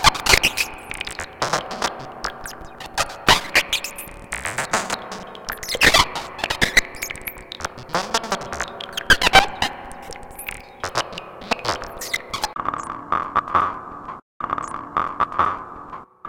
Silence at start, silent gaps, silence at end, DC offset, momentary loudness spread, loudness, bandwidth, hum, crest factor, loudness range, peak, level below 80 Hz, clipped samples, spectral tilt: 0 s; 14.22-14.40 s; 0 s; under 0.1%; 18 LU; -21 LUFS; 17 kHz; none; 24 dB; 5 LU; 0 dBFS; -40 dBFS; under 0.1%; -1.5 dB/octave